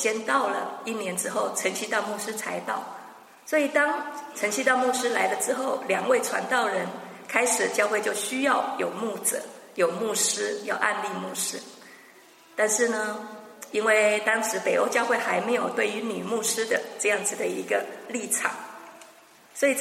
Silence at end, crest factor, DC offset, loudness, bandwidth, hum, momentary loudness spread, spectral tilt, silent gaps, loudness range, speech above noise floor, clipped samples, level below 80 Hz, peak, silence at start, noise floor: 0 s; 20 dB; under 0.1%; -26 LUFS; 16 kHz; none; 11 LU; -2 dB/octave; none; 4 LU; 27 dB; under 0.1%; -84 dBFS; -6 dBFS; 0 s; -53 dBFS